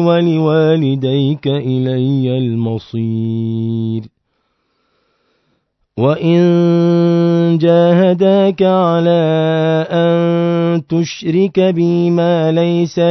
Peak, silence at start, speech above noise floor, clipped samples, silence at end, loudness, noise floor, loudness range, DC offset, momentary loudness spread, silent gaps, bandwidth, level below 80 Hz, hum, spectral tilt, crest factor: 0 dBFS; 0 s; 53 dB; under 0.1%; 0 s; -13 LUFS; -65 dBFS; 9 LU; under 0.1%; 7 LU; none; 6.2 kHz; -60 dBFS; none; -8 dB/octave; 14 dB